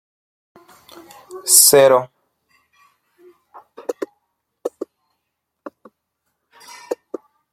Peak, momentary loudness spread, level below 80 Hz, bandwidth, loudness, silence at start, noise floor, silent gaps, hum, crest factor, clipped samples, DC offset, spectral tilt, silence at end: 0 dBFS; 27 LU; -68 dBFS; 16.5 kHz; -12 LUFS; 1.3 s; -77 dBFS; none; none; 22 dB; under 0.1%; under 0.1%; -1 dB/octave; 0.6 s